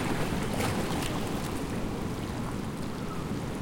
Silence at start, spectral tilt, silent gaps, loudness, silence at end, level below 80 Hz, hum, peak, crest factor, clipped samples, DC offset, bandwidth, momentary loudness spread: 0 s; -5.5 dB/octave; none; -33 LUFS; 0 s; -42 dBFS; none; -16 dBFS; 16 dB; under 0.1%; under 0.1%; 17 kHz; 5 LU